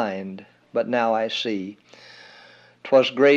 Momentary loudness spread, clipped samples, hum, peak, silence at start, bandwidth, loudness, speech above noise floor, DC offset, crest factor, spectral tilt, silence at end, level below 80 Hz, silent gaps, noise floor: 24 LU; under 0.1%; 60 Hz at -60 dBFS; -4 dBFS; 0 s; 7.6 kHz; -22 LUFS; 29 dB; under 0.1%; 18 dB; -5 dB/octave; 0 s; -78 dBFS; none; -50 dBFS